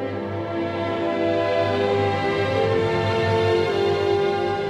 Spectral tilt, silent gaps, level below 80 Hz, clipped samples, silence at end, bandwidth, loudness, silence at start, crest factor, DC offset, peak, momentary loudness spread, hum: -6.5 dB/octave; none; -52 dBFS; under 0.1%; 0 s; 11.5 kHz; -22 LUFS; 0 s; 12 dB; under 0.1%; -8 dBFS; 6 LU; 50 Hz at -40 dBFS